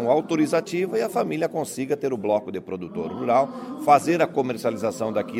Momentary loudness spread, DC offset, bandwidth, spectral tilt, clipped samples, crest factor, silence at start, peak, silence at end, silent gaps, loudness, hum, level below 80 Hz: 10 LU; under 0.1%; 16 kHz; -5.5 dB/octave; under 0.1%; 20 dB; 0 s; -4 dBFS; 0 s; none; -24 LUFS; none; -68 dBFS